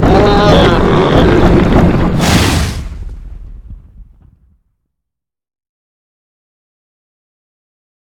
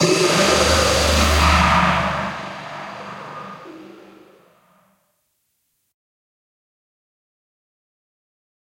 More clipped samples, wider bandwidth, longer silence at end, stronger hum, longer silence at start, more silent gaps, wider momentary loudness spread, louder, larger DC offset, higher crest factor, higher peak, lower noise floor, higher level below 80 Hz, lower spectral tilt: first, 0.3% vs under 0.1%; first, 18.5 kHz vs 16.5 kHz; second, 4.15 s vs 4.75 s; neither; about the same, 0 s vs 0 s; neither; second, 17 LU vs 20 LU; first, -9 LUFS vs -16 LUFS; neither; second, 12 dB vs 20 dB; about the same, 0 dBFS vs -2 dBFS; first, -81 dBFS vs -70 dBFS; first, -20 dBFS vs -32 dBFS; first, -6 dB/octave vs -3.5 dB/octave